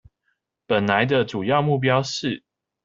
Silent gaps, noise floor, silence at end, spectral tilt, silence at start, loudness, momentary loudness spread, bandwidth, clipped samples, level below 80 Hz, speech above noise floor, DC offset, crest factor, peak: none; -74 dBFS; 0.45 s; -5.5 dB/octave; 0.7 s; -21 LUFS; 8 LU; 7.6 kHz; under 0.1%; -60 dBFS; 53 dB; under 0.1%; 20 dB; -4 dBFS